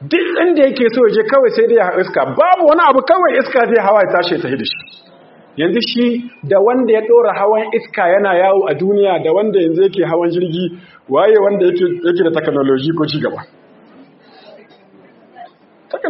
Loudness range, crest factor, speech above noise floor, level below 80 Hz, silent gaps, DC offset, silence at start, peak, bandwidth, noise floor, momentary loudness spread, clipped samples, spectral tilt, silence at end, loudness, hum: 6 LU; 14 dB; 32 dB; -62 dBFS; none; under 0.1%; 0 s; 0 dBFS; 5.8 kHz; -45 dBFS; 8 LU; under 0.1%; -4 dB/octave; 0 s; -13 LUFS; none